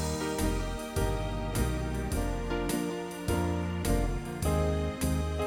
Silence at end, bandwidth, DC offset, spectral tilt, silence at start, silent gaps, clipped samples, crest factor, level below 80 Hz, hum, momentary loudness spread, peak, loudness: 0 s; 17 kHz; under 0.1%; -5.5 dB/octave; 0 s; none; under 0.1%; 14 dB; -36 dBFS; none; 4 LU; -16 dBFS; -32 LUFS